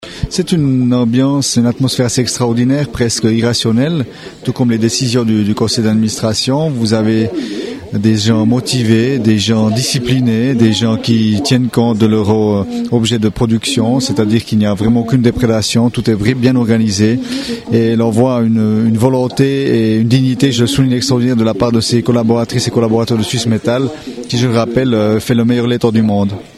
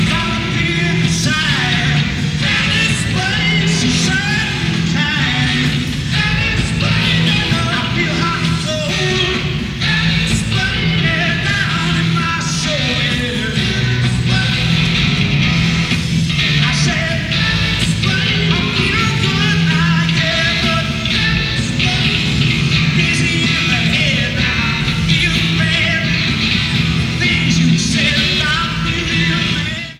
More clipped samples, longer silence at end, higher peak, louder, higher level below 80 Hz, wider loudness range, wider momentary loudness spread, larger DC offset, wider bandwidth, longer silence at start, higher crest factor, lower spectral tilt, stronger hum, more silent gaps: neither; about the same, 0.1 s vs 0 s; about the same, 0 dBFS vs 0 dBFS; about the same, -13 LUFS vs -14 LUFS; second, -40 dBFS vs -30 dBFS; about the same, 2 LU vs 2 LU; about the same, 4 LU vs 3 LU; neither; about the same, 14 kHz vs 13 kHz; about the same, 0 s vs 0 s; about the same, 12 dB vs 14 dB; about the same, -5.5 dB/octave vs -4.5 dB/octave; neither; neither